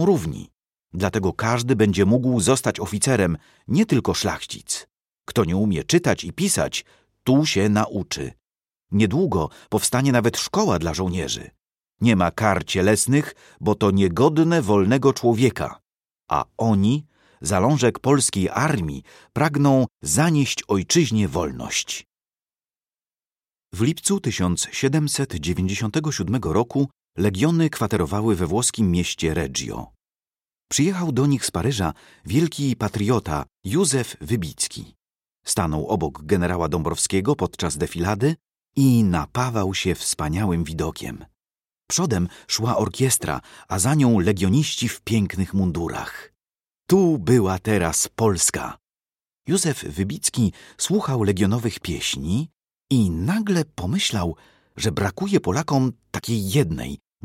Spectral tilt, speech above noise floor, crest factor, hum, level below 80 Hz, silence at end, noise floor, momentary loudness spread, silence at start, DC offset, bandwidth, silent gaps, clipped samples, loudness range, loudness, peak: -5 dB/octave; over 69 dB; 18 dB; none; -44 dBFS; 0.3 s; under -90 dBFS; 10 LU; 0 s; under 0.1%; 16.5 kHz; none; under 0.1%; 4 LU; -22 LUFS; -2 dBFS